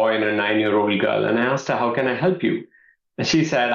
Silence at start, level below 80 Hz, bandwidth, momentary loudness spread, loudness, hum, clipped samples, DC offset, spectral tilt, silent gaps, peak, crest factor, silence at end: 0 s; -62 dBFS; 7.4 kHz; 5 LU; -20 LUFS; none; under 0.1%; under 0.1%; -5 dB/octave; none; -8 dBFS; 12 dB; 0 s